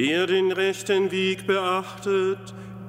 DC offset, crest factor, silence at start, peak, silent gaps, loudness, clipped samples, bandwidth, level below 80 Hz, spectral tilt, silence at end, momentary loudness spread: under 0.1%; 14 dB; 0 s; -10 dBFS; none; -24 LUFS; under 0.1%; 15.5 kHz; -66 dBFS; -4.5 dB/octave; 0 s; 6 LU